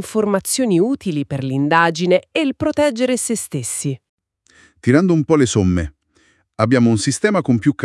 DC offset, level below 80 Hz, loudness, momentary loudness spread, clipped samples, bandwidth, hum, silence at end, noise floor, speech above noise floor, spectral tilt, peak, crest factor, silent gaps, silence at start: under 0.1%; -48 dBFS; -17 LUFS; 8 LU; under 0.1%; 12 kHz; none; 0 s; -58 dBFS; 42 dB; -5.5 dB/octave; 0 dBFS; 18 dB; 4.09-4.18 s; 0 s